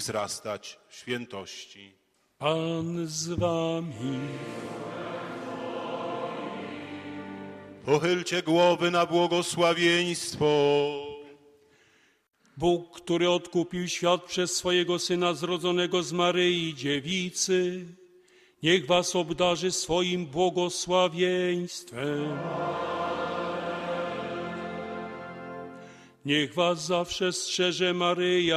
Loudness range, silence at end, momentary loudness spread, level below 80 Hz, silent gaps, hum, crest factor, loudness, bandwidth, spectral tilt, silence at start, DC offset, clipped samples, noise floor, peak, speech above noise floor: 8 LU; 0 s; 15 LU; -62 dBFS; none; none; 20 dB; -27 LUFS; 13.5 kHz; -4 dB/octave; 0 s; under 0.1%; under 0.1%; -63 dBFS; -8 dBFS; 37 dB